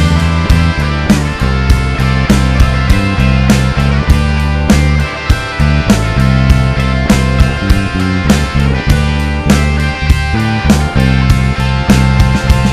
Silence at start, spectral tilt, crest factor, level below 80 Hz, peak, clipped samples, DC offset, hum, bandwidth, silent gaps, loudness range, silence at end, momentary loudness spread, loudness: 0 s; -6 dB/octave; 10 dB; -14 dBFS; 0 dBFS; 0.7%; under 0.1%; none; 14.5 kHz; none; 1 LU; 0 s; 3 LU; -11 LUFS